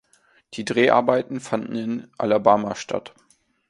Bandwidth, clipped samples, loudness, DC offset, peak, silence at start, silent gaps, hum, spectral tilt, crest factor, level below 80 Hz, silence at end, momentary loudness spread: 11.5 kHz; under 0.1%; -22 LUFS; under 0.1%; 0 dBFS; 0.5 s; none; none; -5 dB/octave; 22 dB; -64 dBFS; 0.6 s; 13 LU